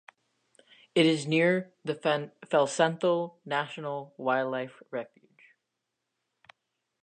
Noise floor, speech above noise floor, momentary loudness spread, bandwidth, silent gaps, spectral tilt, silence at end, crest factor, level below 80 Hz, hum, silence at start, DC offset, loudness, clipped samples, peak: -84 dBFS; 56 dB; 13 LU; 9.6 kHz; none; -5 dB/octave; 2 s; 20 dB; -84 dBFS; none; 0.95 s; under 0.1%; -29 LUFS; under 0.1%; -10 dBFS